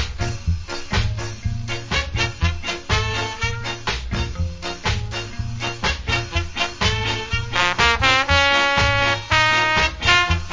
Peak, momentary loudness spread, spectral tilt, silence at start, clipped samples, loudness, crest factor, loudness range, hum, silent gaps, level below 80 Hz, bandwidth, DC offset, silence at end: 0 dBFS; 12 LU; -3.5 dB/octave; 0 s; under 0.1%; -20 LUFS; 20 dB; 8 LU; none; none; -30 dBFS; 7.6 kHz; under 0.1%; 0 s